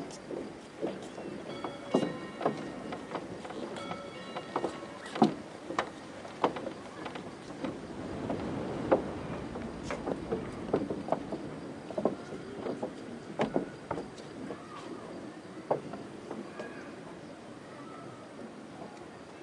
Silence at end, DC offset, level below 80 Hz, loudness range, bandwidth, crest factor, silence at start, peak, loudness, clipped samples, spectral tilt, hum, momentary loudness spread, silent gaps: 0 s; under 0.1%; -62 dBFS; 6 LU; 11.5 kHz; 26 dB; 0 s; -10 dBFS; -38 LUFS; under 0.1%; -6 dB/octave; none; 14 LU; none